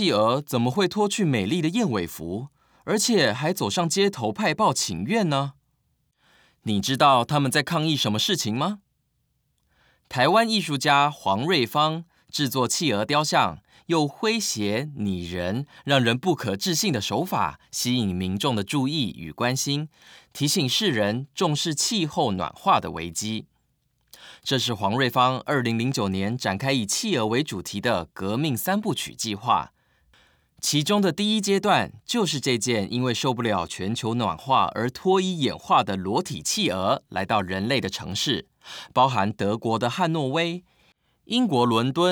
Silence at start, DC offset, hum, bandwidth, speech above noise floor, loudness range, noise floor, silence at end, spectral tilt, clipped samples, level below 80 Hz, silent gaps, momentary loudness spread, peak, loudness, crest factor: 0 s; under 0.1%; none; over 20 kHz; 48 dB; 2 LU; -72 dBFS; 0 s; -4 dB/octave; under 0.1%; -64 dBFS; none; 8 LU; -6 dBFS; -24 LUFS; 20 dB